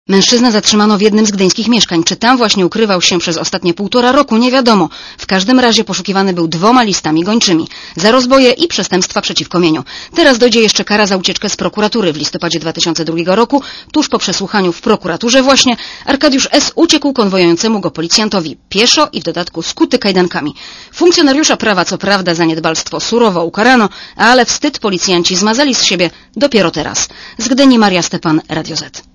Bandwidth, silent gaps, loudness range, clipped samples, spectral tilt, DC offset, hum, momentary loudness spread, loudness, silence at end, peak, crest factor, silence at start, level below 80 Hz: 11 kHz; none; 2 LU; 0.6%; -3.5 dB/octave; under 0.1%; none; 8 LU; -10 LUFS; 0.15 s; 0 dBFS; 10 dB; 0.1 s; -44 dBFS